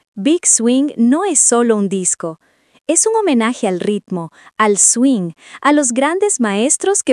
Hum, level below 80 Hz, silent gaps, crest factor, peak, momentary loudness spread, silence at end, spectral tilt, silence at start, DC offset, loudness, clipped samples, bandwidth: none; -72 dBFS; none; 14 dB; 0 dBFS; 11 LU; 0 s; -3 dB/octave; 0.15 s; under 0.1%; -13 LUFS; under 0.1%; 11.5 kHz